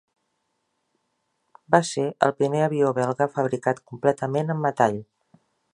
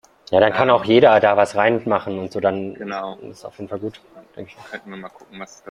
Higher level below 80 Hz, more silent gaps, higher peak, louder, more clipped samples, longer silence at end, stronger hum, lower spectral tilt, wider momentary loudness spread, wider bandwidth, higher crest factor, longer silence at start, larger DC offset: second, -68 dBFS vs -60 dBFS; neither; about the same, -2 dBFS vs -2 dBFS; second, -23 LUFS vs -17 LUFS; neither; first, 0.7 s vs 0 s; neither; about the same, -6 dB/octave vs -6 dB/octave; second, 5 LU vs 24 LU; about the same, 11 kHz vs 11.5 kHz; first, 24 dB vs 18 dB; first, 1.7 s vs 0.3 s; neither